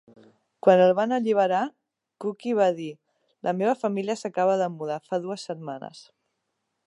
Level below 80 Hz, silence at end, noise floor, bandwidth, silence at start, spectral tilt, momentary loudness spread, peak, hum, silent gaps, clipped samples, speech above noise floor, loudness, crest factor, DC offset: -80 dBFS; 0.85 s; -79 dBFS; 11 kHz; 0.65 s; -6 dB/octave; 15 LU; -4 dBFS; none; none; under 0.1%; 55 dB; -25 LUFS; 22 dB; under 0.1%